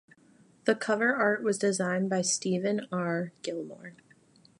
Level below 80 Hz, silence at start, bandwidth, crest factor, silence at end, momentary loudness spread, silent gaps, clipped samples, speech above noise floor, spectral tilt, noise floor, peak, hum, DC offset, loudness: -78 dBFS; 0.65 s; 11.5 kHz; 22 dB; 0.65 s; 12 LU; none; under 0.1%; 32 dB; -4 dB/octave; -61 dBFS; -8 dBFS; none; under 0.1%; -29 LUFS